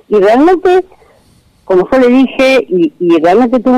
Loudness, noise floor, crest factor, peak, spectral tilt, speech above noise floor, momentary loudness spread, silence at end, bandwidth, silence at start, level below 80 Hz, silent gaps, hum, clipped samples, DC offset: -9 LUFS; -47 dBFS; 8 dB; -2 dBFS; -6 dB/octave; 40 dB; 5 LU; 0 s; 11.5 kHz; 0.1 s; -42 dBFS; none; none; under 0.1%; under 0.1%